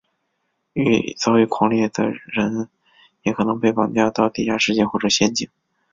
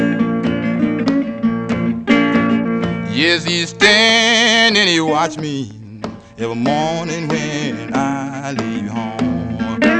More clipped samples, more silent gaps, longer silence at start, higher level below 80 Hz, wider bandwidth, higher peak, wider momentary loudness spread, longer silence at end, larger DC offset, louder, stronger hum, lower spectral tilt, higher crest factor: neither; neither; first, 0.75 s vs 0 s; second, -54 dBFS vs -48 dBFS; second, 7.6 kHz vs 9.4 kHz; about the same, -2 dBFS vs 0 dBFS; second, 9 LU vs 13 LU; first, 0.45 s vs 0 s; neither; second, -19 LUFS vs -15 LUFS; neither; about the same, -4.5 dB/octave vs -4 dB/octave; about the same, 18 dB vs 16 dB